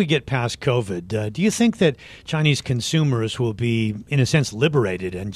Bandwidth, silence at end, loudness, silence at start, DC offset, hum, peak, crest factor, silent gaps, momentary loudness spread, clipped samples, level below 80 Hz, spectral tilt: 14 kHz; 0 s; -21 LUFS; 0 s; under 0.1%; none; -4 dBFS; 18 dB; none; 7 LU; under 0.1%; -50 dBFS; -5.5 dB/octave